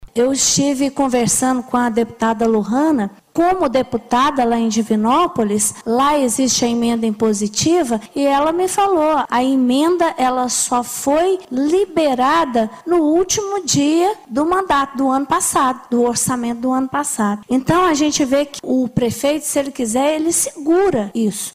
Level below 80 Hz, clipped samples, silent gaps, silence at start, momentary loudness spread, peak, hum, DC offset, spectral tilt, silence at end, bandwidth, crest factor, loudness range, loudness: -48 dBFS; under 0.1%; none; 0 s; 4 LU; -2 dBFS; none; under 0.1%; -3.5 dB/octave; 0.05 s; 16 kHz; 14 dB; 1 LU; -16 LUFS